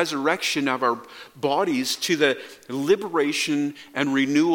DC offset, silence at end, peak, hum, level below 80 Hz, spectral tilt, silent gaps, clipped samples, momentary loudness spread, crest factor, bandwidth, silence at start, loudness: under 0.1%; 0 s; -4 dBFS; none; -72 dBFS; -3.5 dB/octave; none; under 0.1%; 8 LU; 20 dB; 17.5 kHz; 0 s; -23 LUFS